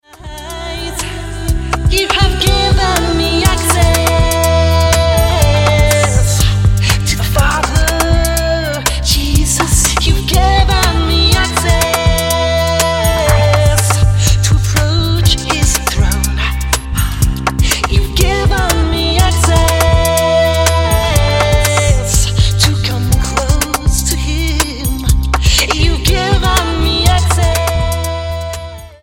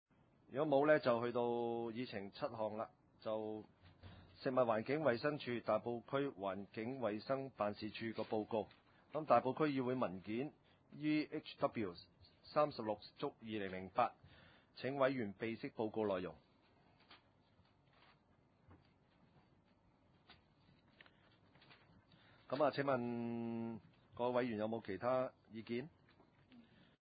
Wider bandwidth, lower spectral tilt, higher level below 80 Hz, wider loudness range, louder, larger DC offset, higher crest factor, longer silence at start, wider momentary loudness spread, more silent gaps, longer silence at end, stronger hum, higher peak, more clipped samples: first, 17 kHz vs 4.9 kHz; about the same, -4 dB/octave vs -5 dB/octave; first, -16 dBFS vs -76 dBFS; about the same, 3 LU vs 4 LU; first, -12 LUFS vs -41 LUFS; neither; second, 12 dB vs 22 dB; second, 0.2 s vs 0.5 s; second, 5 LU vs 12 LU; neither; second, 0.1 s vs 0.4 s; neither; first, 0 dBFS vs -20 dBFS; neither